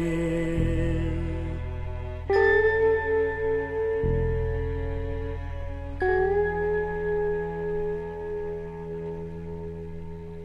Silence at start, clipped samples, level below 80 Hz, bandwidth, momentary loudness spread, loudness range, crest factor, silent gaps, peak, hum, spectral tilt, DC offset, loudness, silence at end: 0 s; under 0.1%; -36 dBFS; 8.8 kHz; 13 LU; 6 LU; 16 dB; none; -10 dBFS; none; -8 dB/octave; under 0.1%; -27 LUFS; 0 s